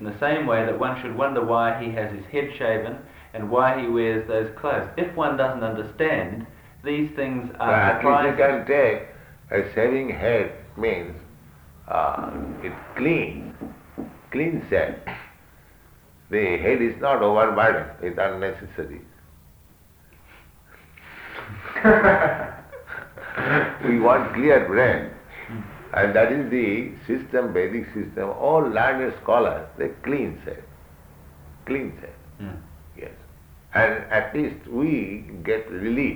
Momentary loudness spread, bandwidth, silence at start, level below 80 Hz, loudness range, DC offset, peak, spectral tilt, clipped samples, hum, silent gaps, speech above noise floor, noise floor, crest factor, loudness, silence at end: 19 LU; over 20 kHz; 0 s; -50 dBFS; 8 LU; under 0.1%; -2 dBFS; -7.5 dB/octave; under 0.1%; none; none; 30 dB; -52 dBFS; 20 dB; -22 LUFS; 0 s